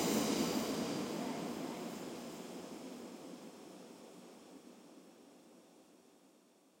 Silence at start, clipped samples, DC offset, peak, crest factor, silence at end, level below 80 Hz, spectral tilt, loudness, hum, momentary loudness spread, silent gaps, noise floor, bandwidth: 0 s; under 0.1%; under 0.1%; -22 dBFS; 22 dB; 0.5 s; -80 dBFS; -4 dB/octave; -41 LUFS; none; 25 LU; none; -68 dBFS; 16.5 kHz